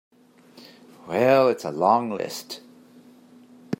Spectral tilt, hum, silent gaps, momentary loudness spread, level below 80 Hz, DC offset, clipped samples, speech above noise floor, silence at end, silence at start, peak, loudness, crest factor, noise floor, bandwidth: -5.5 dB/octave; none; none; 18 LU; -74 dBFS; under 0.1%; under 0.1%; 31 dB; 0.05 s; 1.05 s; -4 dBFS; -22 LUFS; 20 dB; -52 dBFS; 16 kHz